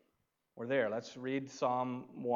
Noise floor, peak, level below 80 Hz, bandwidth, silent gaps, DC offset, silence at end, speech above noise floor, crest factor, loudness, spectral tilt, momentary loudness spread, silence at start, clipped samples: -81 dBFS; -20 dBFS; -88 dBFS; 7.6 kHz; none; under 0.1%; 0 s; 45 dB; 16 dB; -37 LUFS; -5.5 dB/octave; 7 LU; 0.55 s; under 0.1%